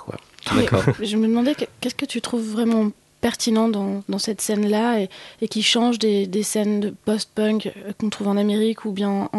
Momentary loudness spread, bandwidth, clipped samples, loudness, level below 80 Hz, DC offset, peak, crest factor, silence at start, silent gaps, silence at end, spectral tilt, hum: 8 LU; 12.5 kHz; under 0.1%; -22 LUFS; -52 dBFS; under 0.1%; -2 dBFS; 20 dB; 0 s; none; 0 s; -4.5 dB/octave; none